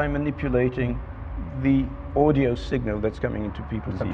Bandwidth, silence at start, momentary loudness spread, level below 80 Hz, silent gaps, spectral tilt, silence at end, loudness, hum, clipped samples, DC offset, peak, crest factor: 7.6 kHz; 0 s; 11 LU; -36 dBFS; none; -9 dB/octave; 0 s; -25 LUFS; none; under 0.1%; under 0.1%; -6 dBFS; 18 dB